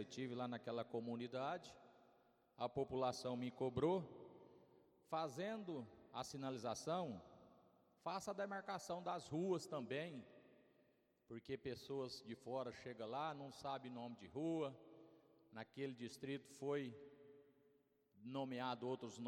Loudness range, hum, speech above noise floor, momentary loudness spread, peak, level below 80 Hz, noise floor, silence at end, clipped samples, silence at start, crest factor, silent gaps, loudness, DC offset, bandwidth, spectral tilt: 5 LU; none; 32 dB; 17 LU; -28 dBFS; -82 dBFS; -78 dBFS; 0 s; under 0.1%; 0 s; 20 dB; none; -48 LUFS; under 0.1%; 16.5 kHz; -5.5 dB/octave